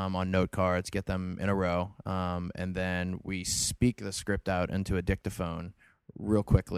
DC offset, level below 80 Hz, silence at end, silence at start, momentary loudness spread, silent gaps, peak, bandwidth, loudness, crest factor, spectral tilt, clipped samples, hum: under 0.1%; -44 dBFS; 0 s; 0 s; 7 LU; none; -8 dBFS; 15.5 kHz; -31 LUFS; 22 dB; -5 dB/octave; under 0.1%; none